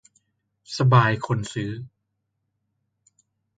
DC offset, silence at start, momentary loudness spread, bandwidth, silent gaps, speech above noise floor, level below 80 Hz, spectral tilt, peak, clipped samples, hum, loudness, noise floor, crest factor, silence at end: under 0.1%; 0.7 s; 17 LU; 9.2 kHz; none; 56 dB; -56 dBFS; -6.5 dB/octave; -2 dBFS; under 0.1%; none; -22 LUFS; -77 dBFS; 24 dB; 1.7 s